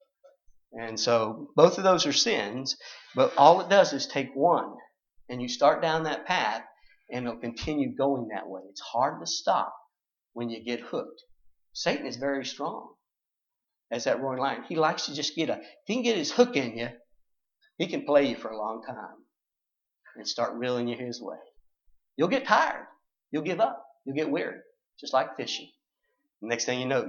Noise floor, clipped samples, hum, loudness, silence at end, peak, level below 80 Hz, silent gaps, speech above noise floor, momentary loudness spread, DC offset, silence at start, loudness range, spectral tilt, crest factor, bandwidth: -87 dBFS; under 0.1%; none; -27 LUFS; 0 s; -4 dBFS; -64 dBFS; none; 60 dB; 17 LU; under 0.1%; 0.75 s; 10 LU; -3.5 dB/octave; 24 dB; 7.4 kHz